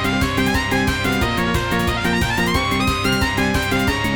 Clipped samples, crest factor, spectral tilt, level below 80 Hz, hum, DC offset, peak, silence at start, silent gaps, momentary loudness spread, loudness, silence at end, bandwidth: under 0.1%; 14 dB; -4.5 dB/octave; -30 dBFS; none; 0.6%; -4 dBFS; 0 s; none; 1 LU; -18 LUFS; 0 s; 19.5 kHz